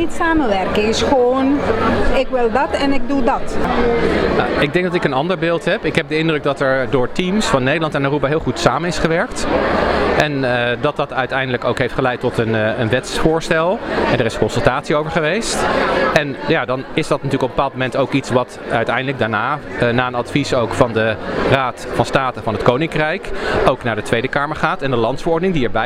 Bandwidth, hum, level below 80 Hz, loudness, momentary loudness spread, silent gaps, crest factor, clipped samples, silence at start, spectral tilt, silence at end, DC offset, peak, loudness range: 14 kHz; none; -32 dBFS; -17 LUFS; 3 LU; none; 16 dB; under 0.1%; 0 s; -5.5 dB/octave; 0 s; under 0.1%; 0 dBFS; 1 LU